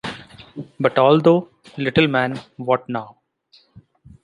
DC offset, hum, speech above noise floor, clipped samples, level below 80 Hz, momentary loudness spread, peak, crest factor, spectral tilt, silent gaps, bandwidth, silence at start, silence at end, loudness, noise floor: under 0.1%; none; 39 dB; under 0.1%; -56 dBFS; 22 LU; -2 dBFS; 18 dB; -7.5 dB/octave; none; 11 kHz; 0.05 s; 1.15 s; -19 LUFS; -56 dBFS